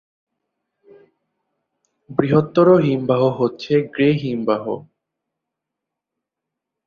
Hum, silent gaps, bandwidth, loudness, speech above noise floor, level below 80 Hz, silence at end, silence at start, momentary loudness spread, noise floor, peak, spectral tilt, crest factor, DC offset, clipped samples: none; none; 6.8 kHz; -18 LUFS; 66 dB; -60 dBFS; 2.05 s; 2.1 s; 10 LU; -83 dBFS; -2 dBFS; -9 dB/octave; 18 dB; under 0.1%; under 0.1%